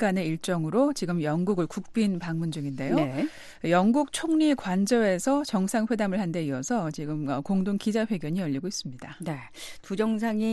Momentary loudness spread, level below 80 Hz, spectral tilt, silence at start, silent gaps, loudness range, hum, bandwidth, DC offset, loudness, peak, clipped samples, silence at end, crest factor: 11 LU; -58 dBFS; -6 dB/octave; 0 s; none; 4 LU; none; 12.5 kHz; under 0.1%; -27 LUFS; -10 dBFS; under 0.1%; 0 s; 16 dB